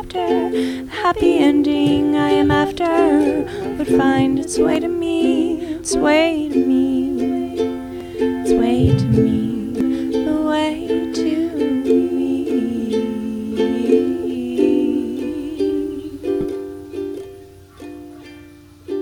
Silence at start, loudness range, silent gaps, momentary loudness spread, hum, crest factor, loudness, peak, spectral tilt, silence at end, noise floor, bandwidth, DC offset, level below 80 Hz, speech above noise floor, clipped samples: 0 s; 6 LU; none; 12 LU; none; 16 dB; -18 LUFS; -2 dBFS; -6 dB/octave; 0 s; -42 dBFS; 15.5 kHz; under 0.1%; -42 dBFS; 26 dB; under 0.1%